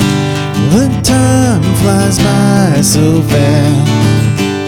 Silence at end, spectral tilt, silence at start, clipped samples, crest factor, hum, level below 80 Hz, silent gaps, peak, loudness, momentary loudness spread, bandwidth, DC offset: 0 s; -5.5 dB/octave; 0 s; under 0.1%; 8 dB; none; -30 dBFS; none; 0 dBFS; -10 LUFS; 3 LU; 17.5 kHz; under 0.1%